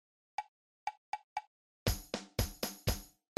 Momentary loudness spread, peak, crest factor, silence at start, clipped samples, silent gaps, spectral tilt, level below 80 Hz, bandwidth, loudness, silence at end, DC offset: 9 LU; -18 dBFS; 24 dB; 0.4 s; under 0.1%; 0.48-0.87 s, 0.97-1.13 s, 1.24-1.36 s, 1.47-1.86 s; -4 dB/octave; -48 dBFS; 16 kHz; -41 LUFS; 0.3 s; under 0.1%